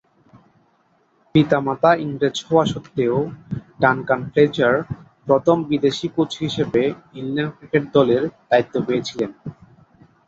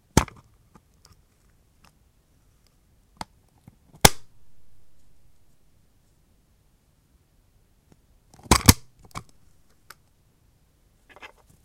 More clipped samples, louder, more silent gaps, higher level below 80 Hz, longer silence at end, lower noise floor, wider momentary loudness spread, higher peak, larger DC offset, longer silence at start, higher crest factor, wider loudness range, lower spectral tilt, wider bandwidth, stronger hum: neither; about the same, -20 LUFS vs -20 LUFS; neither; second, -54 dBFS vs -40 dBFS; first, 0.75 s vs 0.4 s; about the same, -61 dBFS vs -63 dBFS; second, 11 LU vs 30 LU; about the same, -2 dBFS vs 0 dBFS; neither; first, 1.35 s vs 0.15 s; second, 18 dB vs 30 dB; about the same, 2 LU vs 2 LU; first, -6.5 dB/octave vs -3.5 dB/octave; second, 8 kHz vs 16 kHz; neither